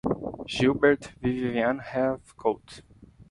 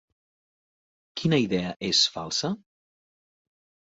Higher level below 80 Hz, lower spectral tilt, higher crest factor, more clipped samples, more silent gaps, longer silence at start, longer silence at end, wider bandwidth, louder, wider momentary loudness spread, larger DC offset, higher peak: first, -52 dBFS vs -62 dBFS; first, -6 dB/octave vs -4 dB/octave; about the same, 20 dB vs 20 dB; neither; neither; second, 0.05 s vs 1.15 s; second, 0.1 s vs 1.3 s; first, 11 kHz vs 8 kHz; about the same, -27 LUFS vs -25 LUFS; about the same, 10 LU vs 12 LU; neither; about the same, -8 dBFS vs -10 dBFS